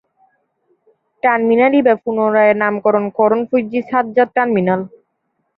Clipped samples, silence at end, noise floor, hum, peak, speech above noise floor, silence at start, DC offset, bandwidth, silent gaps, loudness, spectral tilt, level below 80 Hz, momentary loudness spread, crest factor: under 0.1%; 0.7 s; -69 dBFS; none; 0 dBFS; 55 dB; 1.25 s; under 0.1%; 5.2 kHz; none; -15 LUFS; -10 dB/octave; -62 dBFS; 6 LU; 16 dB